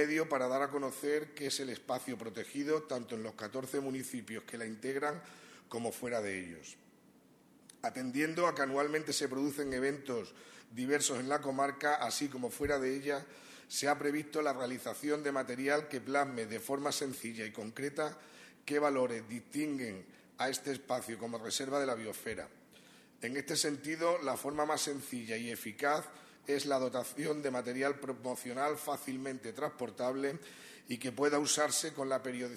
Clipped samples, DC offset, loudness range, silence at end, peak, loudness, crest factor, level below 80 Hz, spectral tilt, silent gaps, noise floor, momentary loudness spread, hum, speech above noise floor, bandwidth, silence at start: under 0.1%; under 0.1%; 5 LU; 0 s; -16 dBFS; -36 LUFS; 20 dB; -72 dBFS; -3 dB/octave; none; -64 dBFS; 10 LU; none; 28 dB; 14 kHz; 0 s